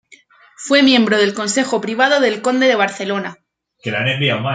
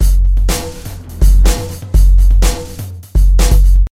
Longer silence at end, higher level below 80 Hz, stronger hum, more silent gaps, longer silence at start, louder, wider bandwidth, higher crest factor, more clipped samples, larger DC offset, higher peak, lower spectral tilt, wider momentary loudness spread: about the same, 0 s vs 0.05 s; second, -64 dBFS vs -10 dBFS; neither; neither; first, 0.6 s vs 0 s; about the same, -15 LUFS vs -13 LUFS; second, 9.4 kHz vs 15.5 kHz; first, 16 dB vs 10 dB; neither; neither; about the same, 0 dBFS vs 0 dBFS; about the same, -4 dB/octave vs -5 dB/octave; second, 12 LU vs 15 LU